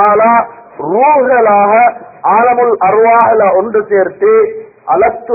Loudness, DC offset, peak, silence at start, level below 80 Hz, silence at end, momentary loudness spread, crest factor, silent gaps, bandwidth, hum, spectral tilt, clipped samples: -9 LUFS; under 0.1%; 0 dBFS; 0 s; -52 dBFS; 0 s; 9 LU; 8 dB; none; 2.7 kHz; none; -10.5 dB/octave; under 0.1%